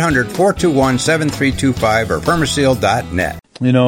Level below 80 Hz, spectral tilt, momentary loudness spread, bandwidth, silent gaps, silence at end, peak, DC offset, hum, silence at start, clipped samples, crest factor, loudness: -34 dBFS; -5 dB/octave; 5 LU; 17 kHz; none; 0 s; 0 dBFS; under 0.1%; none; 0 s; under 0.1%; 14 dB; -15 LUFS